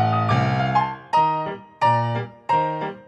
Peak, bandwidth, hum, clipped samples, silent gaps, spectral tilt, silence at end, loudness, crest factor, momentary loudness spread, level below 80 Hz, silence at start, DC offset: -6 dBFS; 8.4 kHz; none; under 0.1%; none; -7.5 dB/octave; 0.05 s; -22 LUFS; 16 dB; 7 LU; -54 dBFS; 0 s; under 0.1%